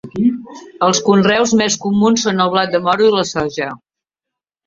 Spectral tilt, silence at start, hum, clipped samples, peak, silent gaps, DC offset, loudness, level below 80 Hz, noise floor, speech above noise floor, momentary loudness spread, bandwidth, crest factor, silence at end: -4 dB/octave; 0.05 s; none; under 0.1%; 0 dBFS; none; under 0.1%; -14 LUFS; -52 dBFS; -84 dBFS; 69 dB; 8 LU; 7.6 kHz; 16 dB; 0.9 s